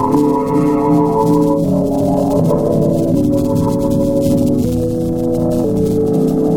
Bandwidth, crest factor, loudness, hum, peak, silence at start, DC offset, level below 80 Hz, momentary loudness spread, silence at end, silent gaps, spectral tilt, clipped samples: 17.5 kHz; 10 dB; -14 LUFS; none; -2 dBFS; 0 s; under 0.1%; -32 dBFS; 3 LU; 0 s; none; -8.5 dB/octave; under 0.1%